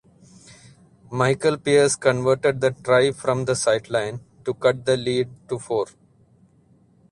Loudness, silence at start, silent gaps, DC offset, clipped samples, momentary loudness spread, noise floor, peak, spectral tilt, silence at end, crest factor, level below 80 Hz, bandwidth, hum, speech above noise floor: -21 LUFS; 1.1 s; none; under 0.1%; under 0.1%; 12 LU; -57 dBFS; -4 dBFS; -4.5 dB/octave; 1.25 s; 20 dB; -58 dBFS; 11.5 kHz; none; 36 dB